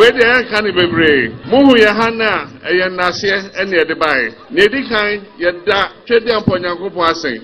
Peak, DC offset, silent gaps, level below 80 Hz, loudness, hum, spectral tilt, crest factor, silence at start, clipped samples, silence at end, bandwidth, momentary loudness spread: 0 dBFS; 0.2%; none; -44 dBFS; -13 LUFS; none; -5 dB/octave; 14 dB; 0 s; 0.1%; 0 s; 11.5 kHz; 8 LU